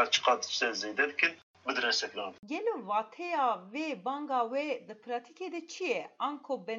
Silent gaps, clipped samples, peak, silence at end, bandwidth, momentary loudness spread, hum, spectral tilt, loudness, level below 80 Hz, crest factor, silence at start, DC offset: 1.43-1.54 s; under 0.1%; -10 dBFS; 0 s; 7.8 kHz; 11 LU; none; -1.5 dB/octave; -33 LUFS; -88 dBFS; 24 dB; 0 s; under 0.1%